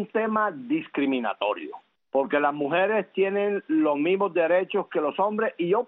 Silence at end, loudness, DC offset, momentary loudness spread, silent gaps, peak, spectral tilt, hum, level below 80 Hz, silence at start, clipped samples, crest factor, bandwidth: 0 s; -25 LUFS; under 0.1%; 5 LU; none; -10 dBFS; -4 dB/octave; none; -76 dBFS; 0 s; under 0.1%; 16 dB; 4 kHz